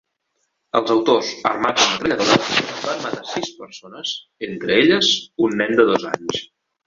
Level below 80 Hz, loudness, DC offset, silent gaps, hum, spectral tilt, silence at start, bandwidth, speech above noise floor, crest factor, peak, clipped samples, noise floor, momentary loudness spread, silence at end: -58 dBFS; -19 LUFS; under 0.1%; none; none; -3 dB/octave; 0.75 s; 7.6 kHz; 53 dB; 18 dB; 0 dBFS; under 0.1%; -72 dBFS; 13 LU; 0.4 s